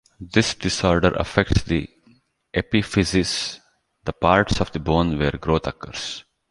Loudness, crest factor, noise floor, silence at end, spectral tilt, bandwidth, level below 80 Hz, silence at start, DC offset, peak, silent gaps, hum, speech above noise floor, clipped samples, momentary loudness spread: -22 LUFS; 20 dB; -58 dBFS; 0.3 s; -5 dB/octave; 11.5 kHz; -36 dBFS; 0.2 s; under 0.1%; -2 dBFS; none; none; 37 dB; under 0.1%; 12 LU